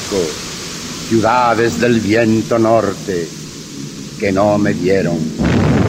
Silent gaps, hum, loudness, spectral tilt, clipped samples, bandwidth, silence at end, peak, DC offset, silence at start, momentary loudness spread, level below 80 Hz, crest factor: none; none; -15 LUFS; -5.5 dB/octave; under 0.1%; 16 kHz; 0 s; -2 dBFS; under 0.1%; 0 s; 14 LU; -36 dBFS; 14 dB